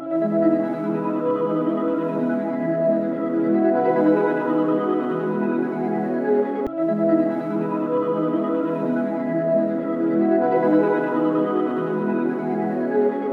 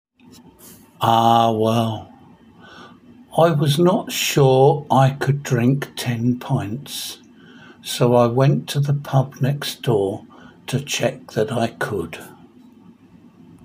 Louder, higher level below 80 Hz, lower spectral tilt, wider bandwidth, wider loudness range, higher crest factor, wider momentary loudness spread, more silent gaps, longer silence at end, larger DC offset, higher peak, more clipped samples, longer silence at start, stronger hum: about the same, -21 LUFS vs -19 LUFS; second, -66 dBFS vs -58 dBFS; first, -10 dB/octave vs -6 dB/octave; second, 4.4 kHz vs 16 kHz; second, 2 LU vs 6 LU; about the same, 14 dB vs 18 dB; second, 5 LU vs 13 LU; neither; second, 0 s vs 1.35 s; neither; second, -8 dBFS vs -2 dBFS; neither; second, 0 s vs 0.65 s; neither